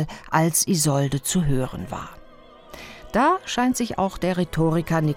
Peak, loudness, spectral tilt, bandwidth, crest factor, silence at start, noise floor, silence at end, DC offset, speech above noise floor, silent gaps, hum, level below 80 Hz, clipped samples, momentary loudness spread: -4 dBFS; -22 LUFS; -5 dB/octave; 19.5 kHz; 18 dB; 0 s; -47 dBFS; 0 s; under 0.1%; 25 dB; none; none; -42 dBFS; under 0.1%; 15 LU